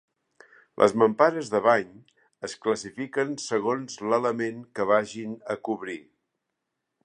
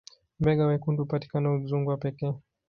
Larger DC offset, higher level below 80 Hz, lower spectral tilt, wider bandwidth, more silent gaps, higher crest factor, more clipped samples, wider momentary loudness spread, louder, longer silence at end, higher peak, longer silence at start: neither; second, -72 dBFS vs -54 dBFS; second, -5 dB/octave vs -9.5 dB/octave; first, 10.5 kHz vs 6.6 kHz; neither; about the same, 22 dB vs 18 dB; neither; first, 15 LU vs 9 LU; about the same, -26 LUFS vs -28 LUFS; first, 1.05 s vs 0.3 s; first, -4 dBFS vs -10 dBFS; first, 0.8 s vs 0.4 s